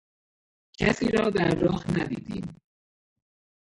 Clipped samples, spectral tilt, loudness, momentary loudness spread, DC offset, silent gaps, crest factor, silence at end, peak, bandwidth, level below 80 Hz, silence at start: under 0.1%; -6.5 dB/octave; -26 LUFS; 13 LU; under 0.1%; none; 22 dB; 1.25 s; -8 dBFS; 11.5 kHz; -50 dBFS; 0.8 s